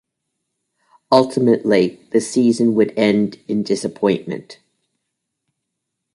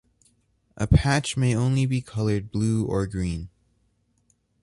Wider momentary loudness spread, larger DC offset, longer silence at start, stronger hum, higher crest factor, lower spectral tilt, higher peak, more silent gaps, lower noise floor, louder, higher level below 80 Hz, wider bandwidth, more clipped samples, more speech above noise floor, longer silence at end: about the same, 8 LU vs 10 LU; neither; first, 1.1 s vs 0.75 s; neither; about the same, 18 dB vs 20 dB; about the same, -6 dB/octave vs -6 dB/octave; first, -2 dBFS vs -6 dBFS; neither; first, -78 dBFS vs -68 dBFS; first, -17 LUFS vs -24 LUFS; second, -62 dBFS vs -36 dBFS; about the same, 11.5 kHz vs 11.5 kHz; neither; first, 61 dB vs 45 dB; first, 1.6 s vs 1.15 s